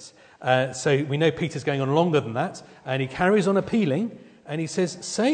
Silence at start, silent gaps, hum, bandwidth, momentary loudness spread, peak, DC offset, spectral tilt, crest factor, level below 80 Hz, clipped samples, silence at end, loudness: 0 s; none; none; 9.4 kHz; 10 LU; -4 dBFS; under 0.1%; -5.5 dB/octave; 18 dB; -60 dBFS; under 0.1%; 0 s; -24 LUFS